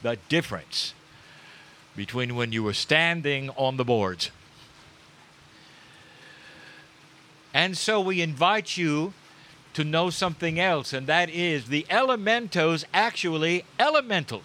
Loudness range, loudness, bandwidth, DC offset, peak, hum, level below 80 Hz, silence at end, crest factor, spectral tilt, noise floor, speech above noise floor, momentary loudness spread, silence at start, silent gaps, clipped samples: 7 LU; -25 LUFS; 16 kHz; under 0.1%; -2 dBFS; none; -64 dBFS; 0 s; 24 dB; -4.5 dB/octave; -53 dBFS; 28 dB; 8 LU; 0 s; none; under 0.1%